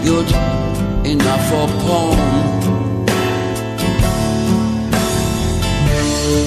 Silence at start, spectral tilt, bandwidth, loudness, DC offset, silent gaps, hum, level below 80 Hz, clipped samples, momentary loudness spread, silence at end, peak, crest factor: 0 s; -5.5 dB/octave; 14 kHz; -16 LUFS; under 0.1%; none; none; -24 dBFS; under 0.1%; 4 LU; 0 s; -2 dBFS; 12 dB